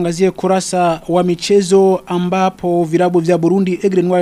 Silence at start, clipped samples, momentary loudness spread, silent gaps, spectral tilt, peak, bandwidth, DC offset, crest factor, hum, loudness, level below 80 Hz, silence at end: 0 s; under 0.1%; 4 LU; none; -6 dB/octave; 0 dBFS; 13 kHz; under 0.1%; 12 dB; none; -14 LUFS; -50 dBFS; 0 s